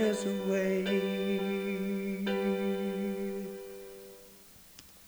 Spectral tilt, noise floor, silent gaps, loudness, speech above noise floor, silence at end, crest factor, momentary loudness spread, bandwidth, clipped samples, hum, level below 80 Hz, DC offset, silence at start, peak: -6 dB/octave; -55 dBFS; none; -33 LUFS; 25 dB; 0 s; 16 dB; 21 LU; over 20 kHz; under 0.1%; none; -68 dBFS; under 0.1%; 0 s; -18 dBFS